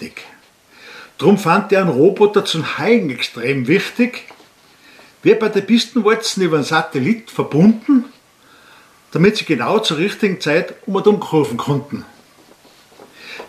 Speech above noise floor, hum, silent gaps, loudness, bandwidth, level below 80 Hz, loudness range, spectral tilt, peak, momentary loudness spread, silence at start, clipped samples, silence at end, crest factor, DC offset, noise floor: 33 dB; none; none; -16 LUFS; 15 kHz; -62 dBFS; 3 LU; -5.5 dB/octave; 0 dBFS; 9 LU; 0 s; under 0.1%; 0 s; 16 dB; under 0.1%; -49 dBFS